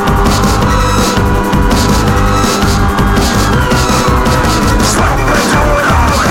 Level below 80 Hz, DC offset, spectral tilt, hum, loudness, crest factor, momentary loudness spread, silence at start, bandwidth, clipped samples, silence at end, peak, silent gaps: -16 dBFS; under 0.1%; -5 dB/octave; none; -10 LUFS; 10 dB; 1 LU; 0 s; 16.5 kHz; under 0.1%; 0 s; 0 dBFS; none